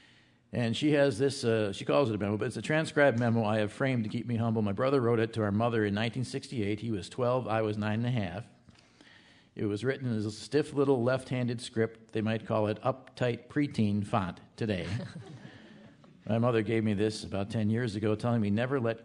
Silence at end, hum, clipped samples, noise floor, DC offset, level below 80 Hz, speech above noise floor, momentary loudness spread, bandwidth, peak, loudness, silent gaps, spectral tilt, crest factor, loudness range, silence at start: 0 s; none; under 0.1%; -62 dBFS; under 0.1%; -68 dBFS; 32 dB; 9 LU; 11 kHz; -12 dBFS; -30 LUFS; none; -6.5 dB/octave; 18 dB; 5 LU; 0.55 s